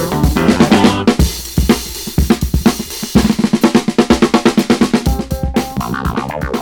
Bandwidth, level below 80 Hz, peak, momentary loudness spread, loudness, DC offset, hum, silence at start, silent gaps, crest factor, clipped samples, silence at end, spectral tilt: 19.5 kHz; -22 dBFS; 0 dBFS; 9 LU; -14 LUFS; under 0.1%; none; 0 s; none; 12 dB; 0.2%; 0 s; -5.5 dB/octave